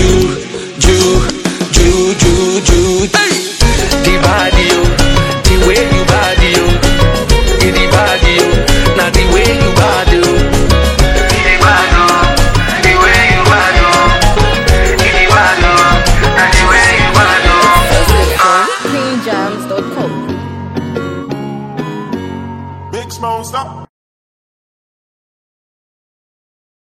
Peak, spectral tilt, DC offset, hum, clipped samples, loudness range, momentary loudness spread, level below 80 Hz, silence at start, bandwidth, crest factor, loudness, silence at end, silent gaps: 0 dBFS; -4 dB/octave; under 0.1%; none; 0.6%; 14 LU; 14 LU; -16 dBFS; 0 s; 16.5 kHz; 10 dB; -9 LUFS; 3.1 s; none